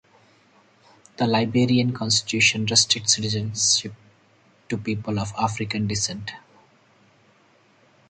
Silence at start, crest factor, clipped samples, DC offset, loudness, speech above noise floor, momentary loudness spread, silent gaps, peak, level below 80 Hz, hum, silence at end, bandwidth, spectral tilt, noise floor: 1.2 s; 22 dB; under 0.1%; under 0.1%; -21 LUFS; 36 dB; 11 LU; none; -4 dBFS; -56 dBFS; none; 1.7 s; 9.6 kHz; -3 dB/octave; -58 dBFS